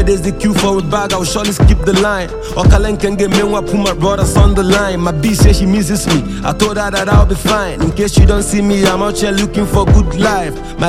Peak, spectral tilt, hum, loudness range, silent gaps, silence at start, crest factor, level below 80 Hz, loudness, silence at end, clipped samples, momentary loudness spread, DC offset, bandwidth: 0 dBFS; -5.5 dB/octave; none; 1 LU; none; 0 s; 12 dB; -16 dBFS; -12 LUFS; 0 s; under 0.1%; 5 LU; under 0.1%; 15.5 kHz